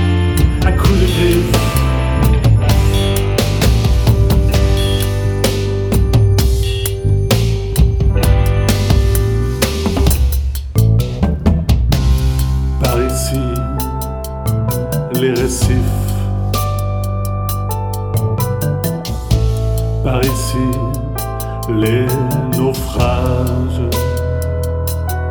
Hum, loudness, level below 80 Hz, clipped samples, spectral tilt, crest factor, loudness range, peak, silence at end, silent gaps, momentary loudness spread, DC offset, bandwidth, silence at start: none; -15 LUFS; -18 dBFS; under 0.1%; -6 dB/octave; 14 dB; 4 LU; 0 dBFS; 0 s; none; 7 LU; under 0.1%; over 20 kHz; 0 s